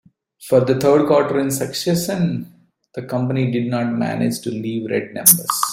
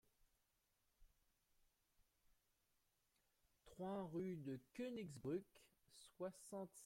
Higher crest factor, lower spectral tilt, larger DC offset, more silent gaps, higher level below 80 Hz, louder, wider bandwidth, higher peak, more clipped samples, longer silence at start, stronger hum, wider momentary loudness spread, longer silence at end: about the same, 18 dB vs 18 dB; second, -4.5 dB/octave vs -6.5 dB/octave; neither; neither; first, -58 dBFS vs -82 dBFS; first, -18 LUFS vs -51 LUFS; about the same, 16 kHz vs 16.5 kHz; first, 0 dBFS vs -36 dBFS; neither; second, 0.4 s vs 1 s; neither; second, 12 LU vs 18 LU; about the same, 0 s vs 0 s